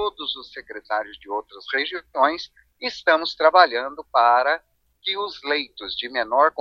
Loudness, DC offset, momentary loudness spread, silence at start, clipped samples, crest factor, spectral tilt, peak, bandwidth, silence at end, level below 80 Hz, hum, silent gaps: -22 LUFS; under 0.1%; 14 LU; 0 s; under 0.1%; 22 dB; -2.5 dB/octave; 0 dBFS; 7.2 kHz; 0 s; -62 dBFS; none; none